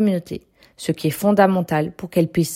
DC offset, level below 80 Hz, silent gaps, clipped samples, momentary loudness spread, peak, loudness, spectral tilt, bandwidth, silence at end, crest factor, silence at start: under 0.1%; -54 dBFS; none; under 0.1%; 13 LU; -2 dBFS; -20 LUFS; -6.5 dB/octave; 16.5 kHz; 0 s; 18 dB; 0 s